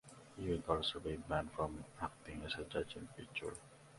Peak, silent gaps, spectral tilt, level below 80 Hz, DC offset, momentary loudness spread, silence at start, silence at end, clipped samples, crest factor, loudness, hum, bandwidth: -20 dBFS; none; -5 dB/octave; -58 dBFS; under 0.1%; 11 LU; 0.05 s; 0 s; under 0.1%; 24 dB; -43 LUFS; none; 11.5 kHz